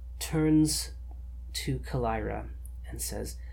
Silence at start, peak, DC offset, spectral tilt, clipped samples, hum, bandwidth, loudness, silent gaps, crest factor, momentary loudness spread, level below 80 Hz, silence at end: 0 s; -16 dBFS; under 0.1%; -5 dB/octave; under 0.1%; none; 18.5 kHz; -30 LUFS; none; 16 dB; 19 LU; -40 dBFS; 0 s